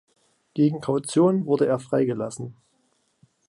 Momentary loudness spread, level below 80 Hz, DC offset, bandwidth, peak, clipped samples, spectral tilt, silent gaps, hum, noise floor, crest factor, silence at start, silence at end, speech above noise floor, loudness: 14 LU; -68 dBFS; under 0.1%; 11.5 kHz; -8 dBFS; under 0.1%; -7 dB/octave; none; none; -68 dBFS; 16 dB; 0.55 s; 0.95 s; 46 dB; -23 LUFS